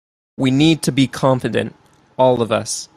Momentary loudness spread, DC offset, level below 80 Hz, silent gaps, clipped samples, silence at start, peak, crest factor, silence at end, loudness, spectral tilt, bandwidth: 8 LU; under 0.1%; -52 dBFS; none; under 0.1%; 0.4 s; -2 dBFS; 16 dB; 0.1 s; -17 LUFS; -5.5 dB/octave; 14.5 kHz